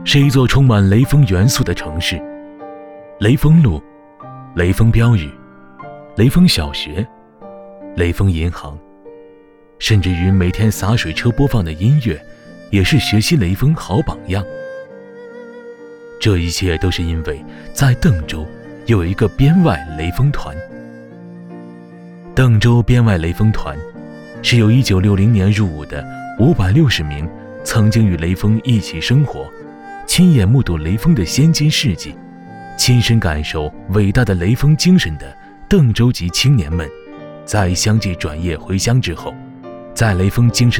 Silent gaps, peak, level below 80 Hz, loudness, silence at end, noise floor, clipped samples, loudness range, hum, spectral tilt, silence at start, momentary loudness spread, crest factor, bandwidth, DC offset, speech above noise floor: none; -2 dBFS; -30 dBFS; -14 LUFS; 0 s; -44 dBFS; under 0.1%; 4 LU; none; -6 dB/octave; 0 s; 22 LU; 12 dB; 18 kHz; under 0.1%; 31 dB